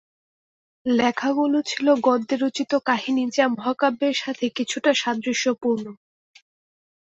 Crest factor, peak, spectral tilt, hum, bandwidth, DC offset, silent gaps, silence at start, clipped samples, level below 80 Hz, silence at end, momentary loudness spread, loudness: 18 dB; -4 dBFS; -3.5 dB/octave; none; 8.2 kHz; under 0.1%; none; 0.85 s; under 0.1%; -68 dBFS; 1.05 s; 5 LU; -22 LUFS